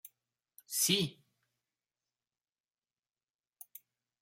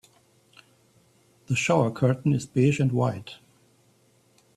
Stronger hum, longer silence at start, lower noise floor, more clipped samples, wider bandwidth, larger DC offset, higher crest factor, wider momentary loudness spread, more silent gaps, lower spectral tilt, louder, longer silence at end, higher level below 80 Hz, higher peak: neither; second, 0.05 s vs 1.5 s; first, under -90 dBFS vs -62 dBFS; neither; first, 16.5 kHz vs 12 kHz; neither; first, 26 dB vs 20 dB; first, 24 LU vs 7 LU; neither; second, -2.5 dB/octave vs -6.5 dB/octave; second, -32 LUFS vs -24 LUFS; first, 3.1 s vs 1.2 s; second, -84 dBFS vs -62 dBFS; second, -16 dBFS vs -8 dBFS